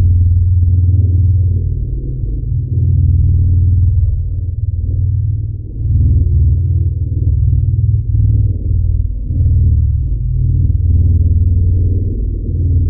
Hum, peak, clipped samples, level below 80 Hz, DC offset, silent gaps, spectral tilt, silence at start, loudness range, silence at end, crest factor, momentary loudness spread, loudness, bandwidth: none; -2 dBFS; under 0.1%; -18 dBFS; under 0.1%; none; -16.5 dB/octave; 0 s; 1 LU; 0 s; 8 dB; 7 LU; -14 LUFS; 0.6 kHz